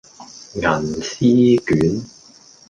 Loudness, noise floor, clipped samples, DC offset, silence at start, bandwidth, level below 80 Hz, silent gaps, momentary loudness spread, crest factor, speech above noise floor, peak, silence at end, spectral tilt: -17 LUFS; -47 dBFS; under 0.1%; under 0.1%; 0.2 s; 9.2 kHz; -46 dBFS; none; 18 LU; 16 dB; 30 dB; -2 dBFS; 0.6 s; -6 dB/octave